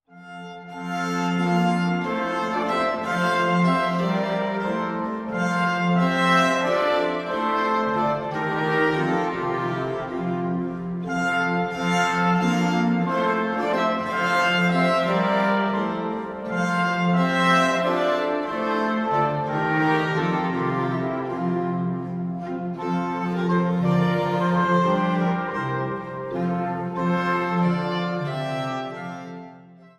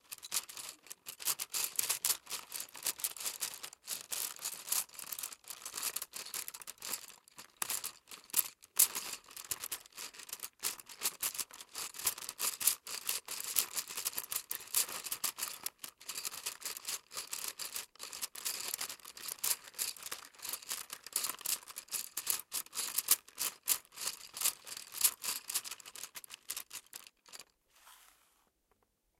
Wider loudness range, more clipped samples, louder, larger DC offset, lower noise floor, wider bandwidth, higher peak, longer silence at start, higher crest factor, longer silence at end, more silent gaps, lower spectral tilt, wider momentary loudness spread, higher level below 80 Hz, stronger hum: about the same, 4 LU vs 5 LU; neither; first, -23 LUFS vs -37 LUFS; neither; second, -47 dBFS vs -77 dBFS; second, 10.5 kHz vs 17 kHz; about the same, -8 dBFS vs -8 dBFS; about the same, 0.15 s vs 0.1 s; second, 16 dB vs 34 dB; second, 0.15 s vs 1.15 s; neither; first, -6.5 dB/octave vs 2 dB/octave; second, 9 LU vs 14 LU; first, -58 dBFS vs -80 dBFS; neither